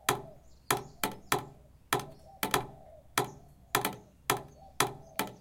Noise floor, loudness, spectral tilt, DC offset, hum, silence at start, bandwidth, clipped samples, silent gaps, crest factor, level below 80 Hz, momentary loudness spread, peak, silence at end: -53 dBFS; -34 LUFS; -2.5 dB/octave; under 0.1%; none; 0.05 s; 17 kHz; under 0.1%; none; 28 dB; -60 dBFS; 16 LU; -6 dBFS; 0.05 s